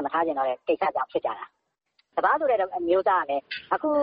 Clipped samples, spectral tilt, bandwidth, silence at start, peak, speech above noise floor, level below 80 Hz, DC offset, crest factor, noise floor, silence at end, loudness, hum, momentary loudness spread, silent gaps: under 0.1%; -8 dB/octave; 5.4 kHz; 0 s; -8 dBFS; 46 dB; -68 dBFS; under 0.1%; 16 dB; -70 dBFS; 0 s; -26 LUFS; none; 10 LU; none